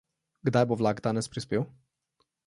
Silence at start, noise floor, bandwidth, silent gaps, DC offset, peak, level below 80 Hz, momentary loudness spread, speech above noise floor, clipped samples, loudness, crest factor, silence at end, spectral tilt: 0.45 s; -76 dBFS; 11.5 kHz; none; under 0.1%; -10 dBFS; -64 dBFS; 7 LU; 49 dB; under 0.1%; -29 LUFS; 20 dB; 0.8 s; -6.5 dB/octave